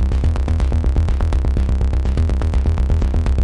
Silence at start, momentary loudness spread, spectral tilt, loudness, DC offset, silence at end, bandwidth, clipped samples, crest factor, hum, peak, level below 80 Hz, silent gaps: 0 s; 1 LU; -8 dB/octave; -19 LUFS; under 0.1%; 0 s; 8.8 kHz; under 0.1%; 10 dB; none; -6 dBFS; -16 dBFS; none